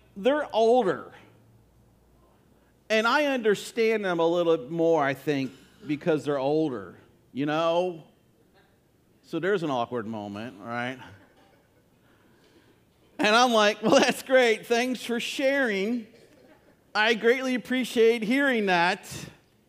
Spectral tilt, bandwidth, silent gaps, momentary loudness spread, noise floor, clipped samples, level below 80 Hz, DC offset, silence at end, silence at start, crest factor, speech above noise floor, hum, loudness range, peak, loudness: -4 dB/octave; 15.5 kHz; none; 14 LU; -63 dBFS; under 0.1%; -70 dBFS; under 0.1%; 0.4 s; 0.15 s; 20 dB; 38 dB; none; 9 LU; -6 dBFS; -25 LUFS